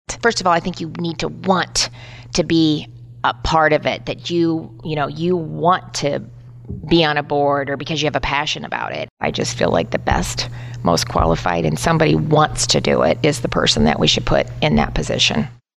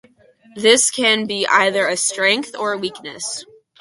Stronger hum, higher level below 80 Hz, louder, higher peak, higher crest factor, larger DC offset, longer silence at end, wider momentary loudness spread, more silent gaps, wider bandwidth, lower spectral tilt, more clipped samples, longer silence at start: neither; first, -34 dBFS vs -66 dBFS; about the same, -18 LUFS vs -17 LUFS; about the same, -2 dBFS vs 0 dBFS; about the same, 16 dB vs 18 dB; neither; about the same, 0.25 s vs 0.35 s; second, 9 LU vs 13 LU; first, 9.11-9.17 s vs none; first, 13.5 kHz vs 11.5 kHz; first, -4.5 dB/octave vs -1 dB/octave; neither; second, 0.1 s vs 0.55 s